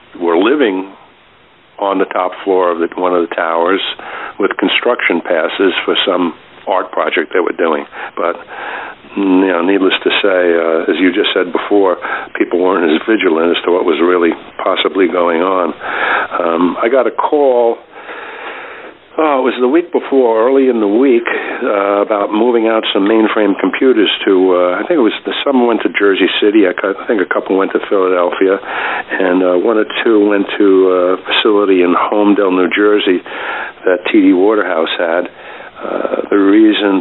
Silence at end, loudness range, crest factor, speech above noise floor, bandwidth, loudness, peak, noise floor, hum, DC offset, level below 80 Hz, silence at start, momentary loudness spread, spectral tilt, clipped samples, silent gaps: 0 s; 3 LU; 12 dB; 34 dB; 4.1 kHz; -12 LUFS; 0 dBFS; -46 dBFS; none; 0.1%; -58 dBFS; 0.15 s; 9 LU; -9.5 dB/octave; under 0.1%; none